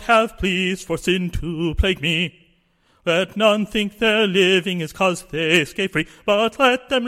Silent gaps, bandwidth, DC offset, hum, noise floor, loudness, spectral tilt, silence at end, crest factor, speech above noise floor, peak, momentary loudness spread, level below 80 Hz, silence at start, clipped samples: none; 16.5 kHz; under 0.1%; none; -61 dBFS; -19 LUFS; -4.5 dB/octave; 0 s; 18 dB; 41 dB; -2 dBFS; 7 LU; -36 dBFS; 0 s; under 0.1%